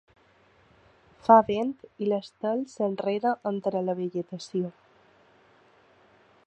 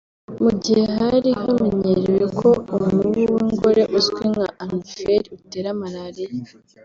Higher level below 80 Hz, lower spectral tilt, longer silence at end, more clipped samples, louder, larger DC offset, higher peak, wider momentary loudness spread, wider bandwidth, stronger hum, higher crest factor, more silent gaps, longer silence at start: second, -70 dBFS vs -50 dBFS; about the same, -7 dB/octave vs -6.5 dB/octave; first, 1.75 s vs 0.4 s; neither; second, -27 LUFS vs -19 LUFS; neither; about the same, -4 dBFS vs -4 dBFS; about the same, 14 LU vs 13 LU; first, 8.8 kHz vs 7.6 kHz; neither; first, 26 dB vs 16 dB; neither; first, 1.25 s vs 0.3 s